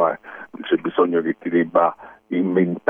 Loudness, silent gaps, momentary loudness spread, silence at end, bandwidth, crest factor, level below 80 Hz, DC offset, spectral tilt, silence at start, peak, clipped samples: -21 LUFS; none; 12 LU; 0.1 s; 3.7 kHz; 18 dB; -64 dBFS; under 0.1%; -10 dB/octave; 0 s; -2 dBFS; under 0.1%